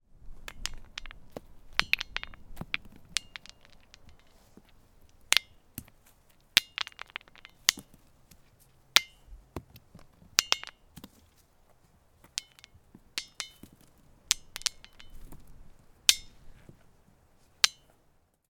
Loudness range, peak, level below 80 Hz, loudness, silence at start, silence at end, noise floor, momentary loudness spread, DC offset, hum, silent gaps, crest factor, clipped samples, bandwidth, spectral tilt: 7 LU; 0 dBFS; -54 dBFS; -29 LUFS; 0.25 s; 0.8 s; -67 dBFS; 23 LU; under 0.1%; none; none; 36 dB; under 0.1%; 19 kHz; 1 dB/octave